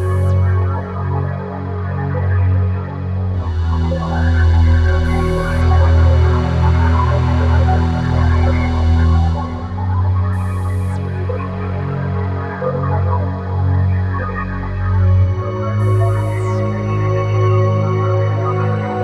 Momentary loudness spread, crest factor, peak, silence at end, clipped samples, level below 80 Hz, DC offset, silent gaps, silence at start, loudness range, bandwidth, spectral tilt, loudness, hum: 8 LU; 12 dB; -2 dBFS; 0 s; under 0.1%; -22 dBFS; under 0.1%; none; 0 s; 5 LU; 6.2 kHz; -8.5 dB/octave; -16 LUFS; none